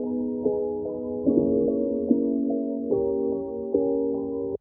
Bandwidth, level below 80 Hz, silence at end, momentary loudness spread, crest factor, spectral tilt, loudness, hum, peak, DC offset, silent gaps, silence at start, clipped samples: 1.2 kHz; -54 dBFS; 0.05 s; 6 LU; 18 dB; -15.5 dB/octave; -26 LUFS; none; -6 dBFS; under 0.1%; none; 0 s; under 0.1%